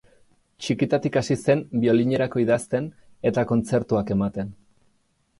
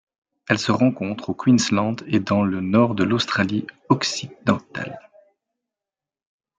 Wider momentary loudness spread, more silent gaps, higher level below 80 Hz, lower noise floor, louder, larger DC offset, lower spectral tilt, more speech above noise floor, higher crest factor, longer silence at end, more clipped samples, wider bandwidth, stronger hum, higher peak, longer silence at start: second, 8 LU vs 11 LU; neither; first, -54 dBFS vs -62 dBFS; second, -66 dBFS vs -89 dBFS; about the same, -23 LUFS vs -21 LUFS; neither; first, -7 dB/octave vs -5 dB/octave; second, 44 dB vs 68 dB; about the same, 18 dB vs 20 dB; second, 0.85 s vs 1.6 s; neither; first, 11.5 kHz vs 9.2 kHz; neither; second, -6 dBFS vs -2 dBFS; about the same, 0.6 s vs 0.5 s